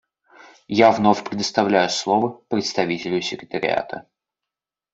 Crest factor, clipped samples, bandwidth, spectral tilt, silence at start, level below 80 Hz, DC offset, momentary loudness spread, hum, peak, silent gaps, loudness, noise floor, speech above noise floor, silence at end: 20 dB; under 0.1%; 8 kHz; -4.5 dB/octave; 0.7 s; -62 dBFS; under 0.1%; 10 LU; none; -2 dBFS; none; -20 LUFS; -87 dBFS; 67 dB; 0.9 s